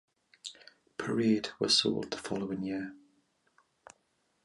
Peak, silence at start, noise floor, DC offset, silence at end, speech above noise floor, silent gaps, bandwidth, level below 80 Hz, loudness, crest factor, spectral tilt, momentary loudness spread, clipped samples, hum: -14 dBFS; 0.45 s; -75 dBFS; under 0.1%; 1.5 s; 44 dB; none; 11.5 kHz; -70 dBFS; -31 LUFS; 22 dB; -4 dB/octave; 20 LU; under 0.1%; none